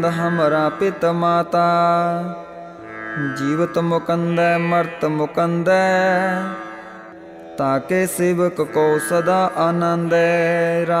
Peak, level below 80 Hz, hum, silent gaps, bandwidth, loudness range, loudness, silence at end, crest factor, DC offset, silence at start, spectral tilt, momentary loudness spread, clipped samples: -6 dBFS; -60 dBFS; none; none; 15.5 kHz; 3 LU; -18 LUFS; 0 s; 14 dB; under 0.1%; 0 s; -6 dB/octave; 16 LU; under 0.1%